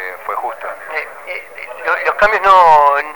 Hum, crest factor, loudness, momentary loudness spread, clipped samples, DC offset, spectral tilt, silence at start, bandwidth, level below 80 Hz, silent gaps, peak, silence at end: none; 14 dB; -12 LUFS; 19 LU; under 0.1%; under 0.1%; -2.5 dB/octave; 0 s; over 20 kHz; -44 dBFS; none; 0 dBFS; 0 s